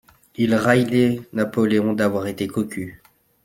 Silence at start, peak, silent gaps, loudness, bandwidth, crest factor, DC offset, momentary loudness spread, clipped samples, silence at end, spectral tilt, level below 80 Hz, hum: 0.4 s; -2 dBFS; none; -20 LUFS; 16.5 kHz; 18 dB; under 0.1%; 12 LU; under 0.1%; 0.5 s; -6.5 dB/octave; -58 dBFS; none